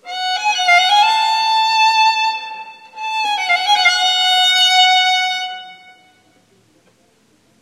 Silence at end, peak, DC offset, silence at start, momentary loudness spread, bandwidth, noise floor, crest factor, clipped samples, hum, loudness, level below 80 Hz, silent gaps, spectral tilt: 1.85 s; 0 dBFS; under 0.1%; 0.05 s; 16 LU; 16 kHz; -56 dBFS; 16 dB; under 0.1%; none; -13 LUFS; -76 dBFS; none; 3 dB/octave